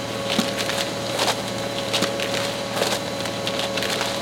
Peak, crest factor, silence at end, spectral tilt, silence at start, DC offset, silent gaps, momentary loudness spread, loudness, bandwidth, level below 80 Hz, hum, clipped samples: -8 dBFS; 16 dB; 0 s; -3 dB/octave; 0 s; under 0.1%; none; 3 LU; -23 LUFS; 17 kHz; -56 dBFS; none; under 0.1%